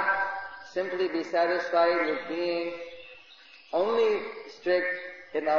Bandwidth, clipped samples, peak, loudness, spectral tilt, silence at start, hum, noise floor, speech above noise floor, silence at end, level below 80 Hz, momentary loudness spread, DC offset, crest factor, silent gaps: 7.2 kHz; under 0.1%; -12 dBFS; -28 LUFS; -4.5 dB/octave; 0 s; none; -53 dBFS; 26 dB; 0 s; -72 dBFS; 13 LU; 0.2%; 16 dB; none